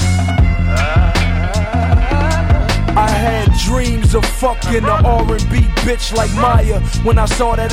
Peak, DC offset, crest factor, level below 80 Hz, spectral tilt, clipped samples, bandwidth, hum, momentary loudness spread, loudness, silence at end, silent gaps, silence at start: 0 dBFS; under 0.1%; 12 dB; -16 dBFS; -5.5 dB/octave; under 0.1%; 15 kHz; none; 4 LU; -14 LUFS; 0 s; none; 0 s